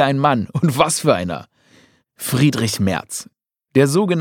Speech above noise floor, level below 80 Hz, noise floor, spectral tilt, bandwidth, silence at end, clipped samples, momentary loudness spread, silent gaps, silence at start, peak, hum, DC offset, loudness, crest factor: 36 dB; -54 dBFS; -53 dBFS; -5 dB/octave; 18 kHz; 0 s; under 0.1%; 13 LU; none; 0 s; 0 dBFS; none; under 0.1%; -18 LUFS; 18 dB